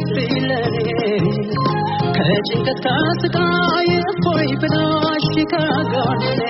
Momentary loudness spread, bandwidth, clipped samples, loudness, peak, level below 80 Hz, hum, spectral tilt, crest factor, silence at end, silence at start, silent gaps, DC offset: 3 LU; 6 kHz; under 0.1%; -18 LUFS; -4 dBFS; -46 dBFS; none; -4.5 dB/octave; 12 dB; 0 s; 0 s; none; under 0.1%